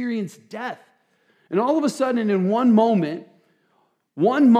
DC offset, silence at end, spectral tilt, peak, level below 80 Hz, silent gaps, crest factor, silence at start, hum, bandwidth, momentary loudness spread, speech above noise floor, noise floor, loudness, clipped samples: under 0.1%; 0 s; -7 dB/octave; -4 dBFS; -86 dBFS; none; 16 dB; 0 s; none; 11 kHz; 16 LU; 46 dB; -66 dBFS; -21 LUFS; under 0.1%